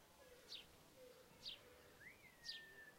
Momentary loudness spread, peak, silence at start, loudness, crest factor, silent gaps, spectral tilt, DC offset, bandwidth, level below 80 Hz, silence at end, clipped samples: 12 LU; -40 dBFS; 0 s; -58 LUFS; 22 dB; none; -1.5 dB/octave; under 0.1%; 16 kHz; -80 dBFS; 0 s; under 0.1%